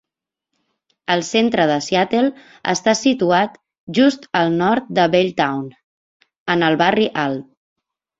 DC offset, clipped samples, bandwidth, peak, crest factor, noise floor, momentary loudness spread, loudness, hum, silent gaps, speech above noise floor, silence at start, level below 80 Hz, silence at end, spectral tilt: under 0.1%; under 0.1%; 8 kHz; -2 dBFS; 18 dB; -85 dBFS; 9 LU; -18 LUFS; none; 3.78-3.87 s, 5.84-6.20 s, 6.38-6.46 s; 68 dB; 1.1 s; -60 dBFS; 0.75 s; -4.5 dB/octave